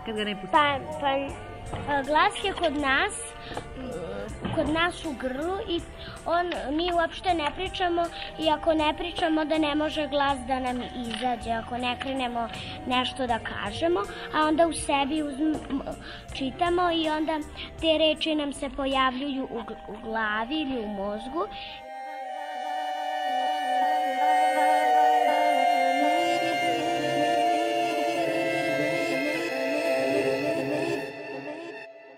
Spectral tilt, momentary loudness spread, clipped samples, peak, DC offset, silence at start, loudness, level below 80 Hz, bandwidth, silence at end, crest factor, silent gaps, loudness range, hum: -4 dB/octave; 13 LU; under 0.1%; -8 dBFS; under 0.1%; 0 s; -26 LUFS; -48 dBFS; 15.5 kHz; 0 s; 18 dB; none; 6 LU; none